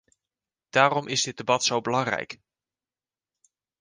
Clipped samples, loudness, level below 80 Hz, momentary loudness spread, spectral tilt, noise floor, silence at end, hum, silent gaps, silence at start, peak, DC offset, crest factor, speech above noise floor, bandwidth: under 0.1%; -24 LUFS; -68 dBFS; 11 LU; -3 dB/octave; under -90 dBFS; 1.45 s; none; none; 0.75 s; -4 dBFS; under 0.1%; 24 dB; over 65 dB; 10.5 kHz